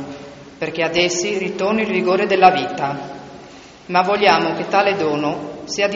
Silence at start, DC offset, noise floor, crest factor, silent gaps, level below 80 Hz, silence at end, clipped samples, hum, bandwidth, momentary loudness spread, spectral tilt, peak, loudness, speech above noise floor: 0 s; under 0.1%; -40 dBFS; 18 dB; none; -56 dBFS; 0 s; under 0.1%; none; 7.8 kHz; 19 LU; -2.5 dB/octave; 0 dBFS; -18 LUFS; 23 dB